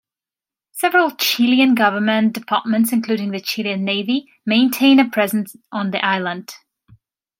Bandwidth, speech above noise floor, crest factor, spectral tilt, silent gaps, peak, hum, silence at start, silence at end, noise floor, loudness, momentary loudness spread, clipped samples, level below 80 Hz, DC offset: 16.5 kHz; 73 dB; 16 dB; -4 dB/octave; none; -2 dBFS; none; 0.75 s; 0.85 s; -90 dBFS; -17 LUFS; 11 LU; under 0.1%; -70 dBFS; under 0.1%